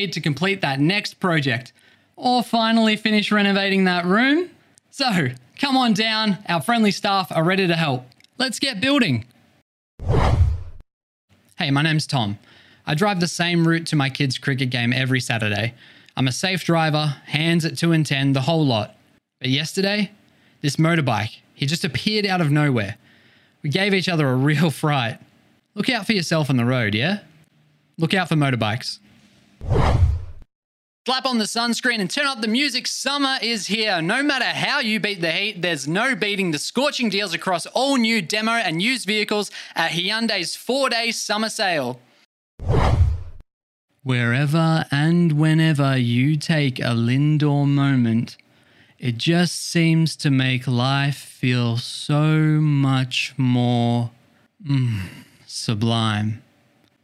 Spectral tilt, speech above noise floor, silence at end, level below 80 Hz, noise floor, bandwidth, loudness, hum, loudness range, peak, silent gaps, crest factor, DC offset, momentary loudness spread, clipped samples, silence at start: -5 dB/octave; 40 dB; 0.65 s; -38 dBFS; -60 dBFS; 14.5 kHz; -20 LUFS; none; 4 LU; 0 dBFS; 9.62-9.98 s, 10.93-11.28 s, 30.55-31.05 s, 42.25-42.58 s, 43.53-43.88 s; 20 dB; under 0.1%; 8 LU; under 0.1%; 0 s